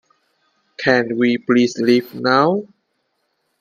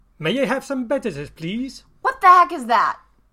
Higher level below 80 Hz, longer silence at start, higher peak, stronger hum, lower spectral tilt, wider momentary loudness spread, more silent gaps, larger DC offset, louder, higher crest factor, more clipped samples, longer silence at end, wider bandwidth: second, -64 dBFS vs -54 dBFS; first, 0.8 s vs 0.2 s; about the same, 0 dBFS vs -2 dBFS; neither; about the same, -5.5 dB/octave vs -5 dB/octave; second, 3 LU vs 17 LU; neither; neither; about the same, -17 LUFS vs -19 LUFS; about the same, 18 dB vs 18 dB; neither; first, 0.95 s vs 0.4 s; about the same, 14.5 kHz vs 14.5 kHz